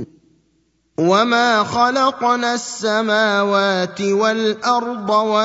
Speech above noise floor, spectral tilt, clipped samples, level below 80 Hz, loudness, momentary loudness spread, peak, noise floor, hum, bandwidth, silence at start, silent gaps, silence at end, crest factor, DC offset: 46 dB; -4 dB/octave; under 0.1%; -62 dBFS; -17 LUFS; 6 LU; -2 dBFS; -63 dBFS; none; 8 kHz; 0 s; none; 0 s; 16 dB; under 0.1%